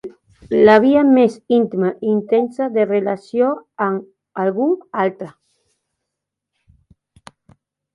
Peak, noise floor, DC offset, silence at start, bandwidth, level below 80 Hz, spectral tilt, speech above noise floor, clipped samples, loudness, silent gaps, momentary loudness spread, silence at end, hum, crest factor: 0 dBFS; -81 dBFS; under 0.1%; 0.05 s; 10.5 kHz; -58 dBFS; -7.5 dB/octave; 65 dB; under 0.1%; -17 LUFS; none; 11 LU; 2.65 s; none; 18 dB